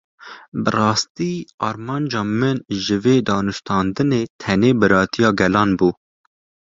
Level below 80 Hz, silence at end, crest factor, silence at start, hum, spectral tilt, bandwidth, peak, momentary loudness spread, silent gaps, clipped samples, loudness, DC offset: -48 dBFS; 0.75 s; 18 dB; 0.2 s; none; -5.5 dB/octave; 7.8 kHz; -2 dBFS; 10 LU; 0.48-0.52 s, 1.10-1.15 s, 1.54-1.58 s, 4.30-4.39 s; under 0.1%; -19 LUFS; under 0.1%